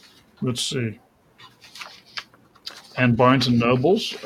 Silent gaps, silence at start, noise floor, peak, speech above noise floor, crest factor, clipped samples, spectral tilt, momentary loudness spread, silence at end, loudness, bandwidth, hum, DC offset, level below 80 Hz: none; 0.4 s; -51 dBFS; -4 dBFS; 32 dB; 20 dB; under 0.1%; -5.5 dB/octave; 22 LU; 0 s; -21 LUFS; 14.5 kHz; none; under 0.1%; -56 dBFS